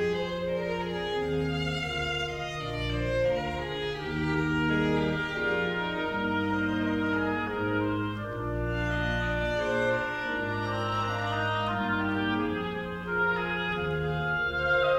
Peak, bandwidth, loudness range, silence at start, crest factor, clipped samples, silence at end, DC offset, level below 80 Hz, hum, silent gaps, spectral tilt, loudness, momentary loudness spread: -14 dBFS; 15.5 kHz; 2 LU; 0 s; 14 dB; under 0.1%; 0 s; under 0.1%; -44 dBFS; none; none; -6.5 dB/octave; -29 LUFS; 5 LU